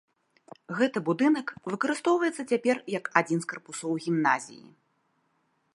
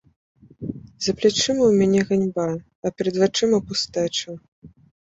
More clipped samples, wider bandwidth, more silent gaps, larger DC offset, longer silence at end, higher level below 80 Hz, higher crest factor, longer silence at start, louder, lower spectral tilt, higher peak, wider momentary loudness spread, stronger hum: neither; first, 11.5 kHz vs 8.2 kHz; second, none vs 2.75-2.82 s, 4.48-4.62 s; neither; first, 1.15 s vs 0.4 s; second, -80 dBFS vs -56 dBFS; first, 26 dB vs 18 dB; about the same, 0.7 s vs 0.6 s; second, -28 LUFS vs -21 LUFS; about the same, -5 dB/octave vs -4.5 dB/octave; about the same, -4 dBFS vs -6 dBFS; second, 10 LU vs 16 LU; neither